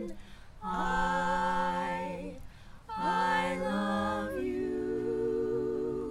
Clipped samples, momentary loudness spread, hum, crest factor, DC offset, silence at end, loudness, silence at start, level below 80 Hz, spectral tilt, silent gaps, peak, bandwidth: under 0.1%; 13 LU; none; 14 dB; under 0.1%; 0 s; -32 LUFS; 0 s; -50 dBFS; -6 dB/octave; none; -18 dBFS; 16 kHz